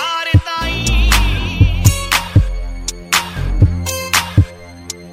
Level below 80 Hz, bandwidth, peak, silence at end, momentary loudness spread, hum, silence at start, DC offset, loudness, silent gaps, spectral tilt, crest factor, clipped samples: -20 dBFS; 16 kHz; 0 dBFS; 0 s; 11 LU; none; 0 s; under 0.1%; -15 LUFS; none; -4 dB/octave; 14 dB; under 0.1%